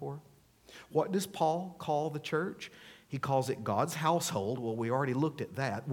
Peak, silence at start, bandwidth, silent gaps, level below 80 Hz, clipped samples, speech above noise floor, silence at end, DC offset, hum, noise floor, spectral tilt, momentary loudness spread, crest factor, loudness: -16 dBFS; 0 s; 18 kHz; none; -72 dBFS; under 0.1%; 28 dB; 0 s; under 0.1%; none; -61 dBFS; -5.5 dB/octave; 13 LU; 18 dB; -33 LUFS